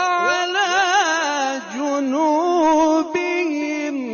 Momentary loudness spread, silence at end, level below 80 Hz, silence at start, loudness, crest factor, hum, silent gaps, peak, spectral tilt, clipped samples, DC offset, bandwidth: 7 LU; 0 s; -62 dBFS; 0 s; -19 LUFS; 12 dB; none; none; -8 dBFS; -1.5 dB/octave; under 0.1%; under 0.1%; 7 kHz